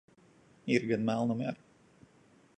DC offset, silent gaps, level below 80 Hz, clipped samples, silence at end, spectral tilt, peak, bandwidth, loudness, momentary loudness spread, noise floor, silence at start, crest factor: under 0.1%; none; -74 dBFS; under 0.1%; 1.05 s; -6.5 dB/octave; -14 dBFS; 9 kHz; -32 LUFS; 14 LU; -63 dBFS; 0.65 s; 22 dB